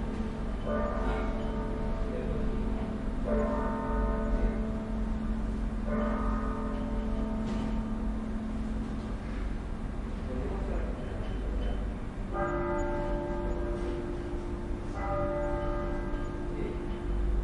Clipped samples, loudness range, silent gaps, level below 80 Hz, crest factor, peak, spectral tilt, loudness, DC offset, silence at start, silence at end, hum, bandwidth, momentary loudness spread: under 0.1%; 3 LU; none; -34 dBFS; 14 dB; -18 dBFS; -8 dB/octave; -34 LUFS; under 0.1%; 0 s; 0 s; none; 10.5 kHz; 6 LU